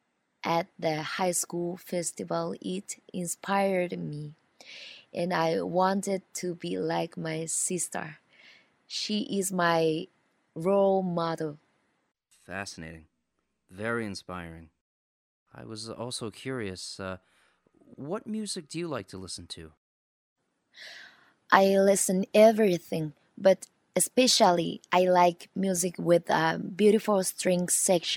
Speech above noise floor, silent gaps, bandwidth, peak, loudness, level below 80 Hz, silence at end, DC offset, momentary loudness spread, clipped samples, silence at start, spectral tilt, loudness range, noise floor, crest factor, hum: 52 dB; 14.81-15.46 s, 19.77-20.36 s; 16.5 kHz; -2 dBFS; -27 LUFS; -70 dBFS; 0 s; under 0.1%; 18 LU; under 0.1%; 0.45 s; -4 dB/octave; 15 LU; -80 dBFS; 28 dB; none